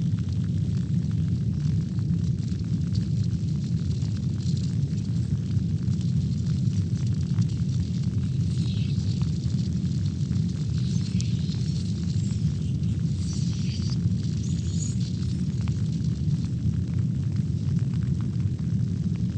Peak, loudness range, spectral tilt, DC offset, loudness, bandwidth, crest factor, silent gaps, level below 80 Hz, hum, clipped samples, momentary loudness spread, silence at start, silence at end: -12 dBFS; 1 LU; -7.5 dB/octave; under 0.1%; -27 LUFS; 9 kHz; 14 dB; none; -40 dBFS; none; under 0.1%; 2 LU; 0 s; 0 s